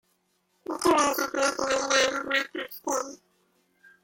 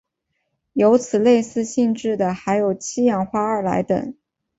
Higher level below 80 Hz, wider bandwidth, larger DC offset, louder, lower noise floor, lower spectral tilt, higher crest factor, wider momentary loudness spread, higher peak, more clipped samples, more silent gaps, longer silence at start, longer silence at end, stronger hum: second, -64 dBFS vs -58 dBFS; first, 16.5 kHz vs 8 kHz; neither; second, -26 LUFS vs -20 LUFS; about the same, -72 dBFS vs -74 dBFS; second, -1 dB/octave vs -6 dB/octave; about the same, 20 dB vs 16 dB; first, 13 LU vs 7 LU; second, -10 dBFS vs -4 dBFS; neither; neither; about the same, 0.7 s vs 0.75 s; first, 0.9 s vs 0.45 s; neither